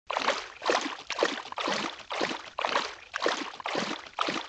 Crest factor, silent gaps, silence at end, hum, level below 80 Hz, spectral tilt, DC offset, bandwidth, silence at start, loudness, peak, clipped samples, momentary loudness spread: 22 dB; none; 0 s; none; -70 dBFS; -2 dB/octave; under 0.1%; 9.2 kHz; 0.1 s; -31 LUFS; -10 dBFS; under 0.1%; 4 LU